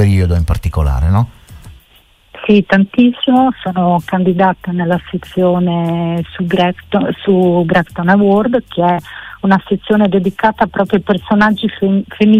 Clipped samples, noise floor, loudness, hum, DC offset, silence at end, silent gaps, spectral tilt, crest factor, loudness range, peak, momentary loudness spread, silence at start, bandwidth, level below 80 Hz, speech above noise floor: under 0.1%; -48 dBFS; -13 LUFS; none; under 0.1%; 0 s; none; -8 dB/octave; 12 dB; 2 LU; 0 dBFS; 6 LU; 0 s; 13 kHz; -28 dBFS; 36 dB